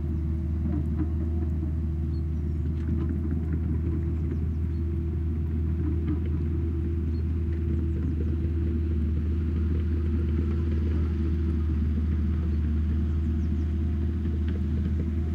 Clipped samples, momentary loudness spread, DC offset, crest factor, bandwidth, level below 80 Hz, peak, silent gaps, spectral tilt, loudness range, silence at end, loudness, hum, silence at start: under 0.1%; 2 LU; under 0.1%; 10 dB; 3.5 kHz; -30 dBFS; -16 dBFS; none; -10.5 dB/octave; 2 LU; 0 s; -28 LUFS; none; 0 s